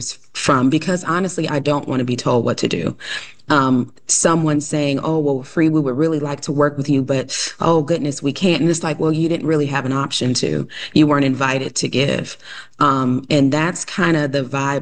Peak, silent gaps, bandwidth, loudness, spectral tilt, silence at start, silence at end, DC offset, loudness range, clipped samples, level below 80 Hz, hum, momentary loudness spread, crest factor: -2 dBFS; none; 10 kHz; -18 LUFS; -5 dB/octave; 0 s; 0 s; 0.3%; 1 LU; under 0.1%; -52 dBFS; none; 7 LU; 16 dB